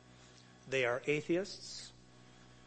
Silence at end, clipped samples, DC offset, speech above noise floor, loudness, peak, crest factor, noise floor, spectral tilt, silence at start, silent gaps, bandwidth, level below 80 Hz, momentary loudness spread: 0.1 s; under 0.1%; under 0.1%; 24 dB; -37 LUFS; -20 dBFS; 18 dB; -60 dBFS; -4.5 dB/octave; 0.1 s; none; 8.4 kHz; -72 dBFS; 24 LU